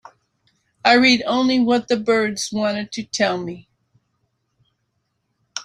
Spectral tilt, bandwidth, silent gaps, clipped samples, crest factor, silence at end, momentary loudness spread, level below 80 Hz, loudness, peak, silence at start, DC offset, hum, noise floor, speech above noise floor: -3.5 dB/octave; 11.5 kHz; none; under 0.1%; 20 dB; 0 s; 14 LU; -62 dBFS; -18 LUFS; -2 dBFS; 0.85 s; under 0.1%; none; -72 dBFS; 54 dB